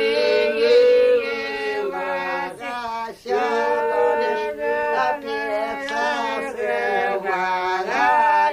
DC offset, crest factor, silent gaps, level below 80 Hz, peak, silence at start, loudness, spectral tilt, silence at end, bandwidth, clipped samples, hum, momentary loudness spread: under 0.1%; 14 dB; none; -58 dBFS; -6 dBFS; 0 s; -21 LUFS; -3.5 dB/octave; 0 s; 15 kHz; under 0.1%; none; 9 LU